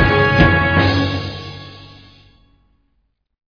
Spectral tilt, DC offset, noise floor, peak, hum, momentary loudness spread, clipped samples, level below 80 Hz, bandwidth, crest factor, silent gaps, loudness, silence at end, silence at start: -7 dB/octave; under 0.1%; -66 dBFS; 0 dBFS; none; 21 LU; under 0.1%; -32 dBFS; 5.4 kHz; 18 dB; none; -14 LUFS; 1.6 s; 0 s